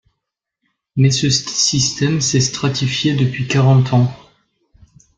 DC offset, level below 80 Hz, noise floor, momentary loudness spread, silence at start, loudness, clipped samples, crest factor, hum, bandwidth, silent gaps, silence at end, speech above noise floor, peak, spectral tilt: under 0.1%; -48 dBFS; -78 dBFS; 5 LU; 0.95 s; -15 LUFS; under 0.1%; 16 dB; none; 9.2 kHz; none; 1 s; 63 dB; -2 dBFS; -4.5 dB/octave